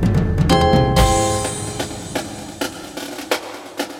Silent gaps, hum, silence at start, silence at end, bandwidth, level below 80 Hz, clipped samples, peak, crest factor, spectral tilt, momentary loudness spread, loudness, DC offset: none; none; 0 s; 0 s; 17 kHz; -28 dBFS; under 0.1%; 0 dBFS; 18 dB; -5 dB/octave; 15 LU; -19 LUFS; under 0.1%